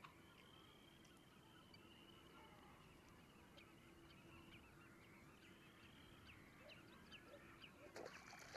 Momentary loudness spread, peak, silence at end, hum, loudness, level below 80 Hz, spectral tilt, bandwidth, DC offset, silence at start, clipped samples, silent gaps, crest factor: 7 LU; -40 dBFS; 0 s; none; -64 LUFS; -78 dBFS; -4 dB/octave; 13 kHz; under 0.1%; 0 s; under 0.1%; none; 24 dB